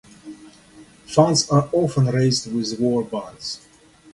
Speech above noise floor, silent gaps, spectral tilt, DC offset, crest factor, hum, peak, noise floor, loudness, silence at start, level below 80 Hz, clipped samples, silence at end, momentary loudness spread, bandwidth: 28 dB; none; -5.5 dB/octave; under 0.1%; 20 dB; none; -2 dBFS; -48 dBFS; -20 LUFS; 0.25 s; -56 dBFS; under 0.1%; 0.55 s; 19 LU; 11.5 kHz